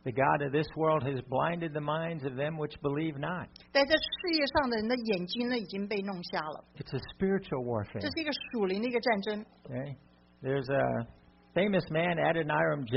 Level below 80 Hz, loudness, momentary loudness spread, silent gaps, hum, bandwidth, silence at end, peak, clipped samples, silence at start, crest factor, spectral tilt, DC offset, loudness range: -60 dBFS; -32 LUFS; 11 LU; none; none; 5.8 kHz; 0 s; -12 dBFS; under 0.1%; 0.05 s; 20 dB; -4 dB/octave; under 0.1%; 3 LU